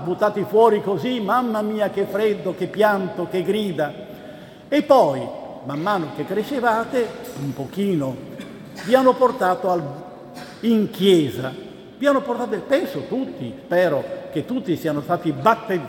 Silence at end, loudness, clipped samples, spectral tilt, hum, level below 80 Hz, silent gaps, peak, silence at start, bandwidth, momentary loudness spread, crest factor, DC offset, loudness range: 0 s; -21 LUFS; under 0.1%; -6.5 dB/octave; none; -62 dBFS; none; -2 dBFS; 0 s; 18 kHz; 17 LU; 20 dB; under 0.1%; 3 LU